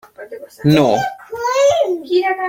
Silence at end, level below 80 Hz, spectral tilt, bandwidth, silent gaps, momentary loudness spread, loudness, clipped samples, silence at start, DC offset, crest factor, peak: 0 s; -52 dBFS; -5.5 dB/octave; 16.5 kHz; none; 20 LU; -16 LUFS; under 0.1%; 0.2 s; under 0.1%; 14 dB; -2 dBFS